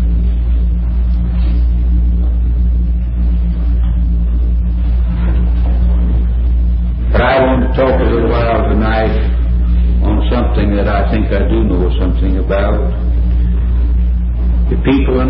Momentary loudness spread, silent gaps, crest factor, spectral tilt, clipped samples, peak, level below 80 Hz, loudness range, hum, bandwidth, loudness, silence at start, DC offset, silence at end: 3 LU; none; 10 dB; -13.5 dB/octave; under 0.1%; -2 dBFS; -12 dBFS; 2 LU; none; 4.6 kHz; -14 LUFS; 0 s; under 0.1%; 0 s